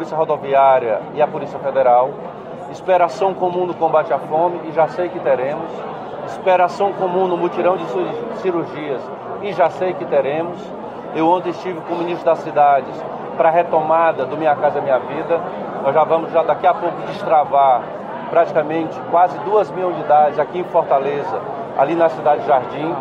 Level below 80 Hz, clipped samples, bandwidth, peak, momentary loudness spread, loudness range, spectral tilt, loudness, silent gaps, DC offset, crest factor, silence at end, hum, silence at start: -62 dBFS; under 0.1%; 7.8 kHz; -2 dBFS; 12 LU; 3 LU; -7 dB/octave; -18 LUFS; none; under 0.1%; 14 dB; 0 s; none; 0 s